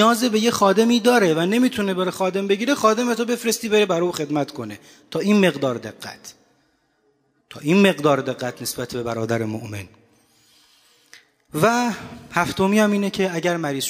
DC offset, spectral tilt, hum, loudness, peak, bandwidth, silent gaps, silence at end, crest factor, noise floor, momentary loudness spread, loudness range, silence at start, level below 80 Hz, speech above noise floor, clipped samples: under 0.1%; -4.5 dB/octave; none; -20 LUFS; -4 dBFS; 16 kHz; none; 0 s; 18 dB; -65 dBFS; 14 LU; 7 LU; 0 s; -60 dBFS; 45 dB; under 0.1%